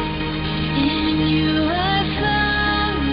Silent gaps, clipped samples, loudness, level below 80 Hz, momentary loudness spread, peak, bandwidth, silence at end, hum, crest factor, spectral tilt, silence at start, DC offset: none; under 0.1%; -19 LUFS; -32 dBFS; 5 LU; -8 dBFS; 5.4 kHz; 0 s; none; 12 dB; -11 dB/octave; 0 s; under 0.1%